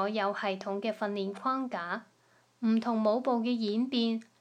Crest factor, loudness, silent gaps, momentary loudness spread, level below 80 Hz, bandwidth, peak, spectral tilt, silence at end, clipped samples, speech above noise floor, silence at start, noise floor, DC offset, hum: 16 dB; -31 LUFS; none; 6 LU; -88 dBFS; 8.8 kHz; -16 dBFS; -6.5 dB/octave; 0.2 s; under 0.1%; 36 dB; 0 s; -66 dBFS; under 0.1%; none